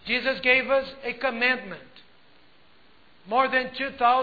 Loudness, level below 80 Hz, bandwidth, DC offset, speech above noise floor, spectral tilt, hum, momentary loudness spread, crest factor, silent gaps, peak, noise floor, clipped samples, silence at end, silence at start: -24 LUFS; -62 dBFS; 4.9 kHz; 0.2%; 34 dB; -5.5 dB/octave; none; 11 LU; 20 dB; none; -6 dBFS; -59 dBFS; under 0.1%; 0 s; 0.05 s